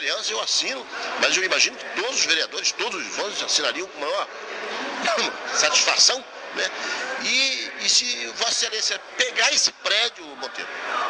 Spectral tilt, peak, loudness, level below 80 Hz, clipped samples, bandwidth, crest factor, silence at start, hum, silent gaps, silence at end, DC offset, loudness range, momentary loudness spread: 1.5 dB/octave; -2 dBFS; -21 LUFS; -70 dBFS; under 0.1%; 10.5 kHz; 22 dB; 0 s; none; none; 0 s; under 0.1%; 4 LU; 12 LU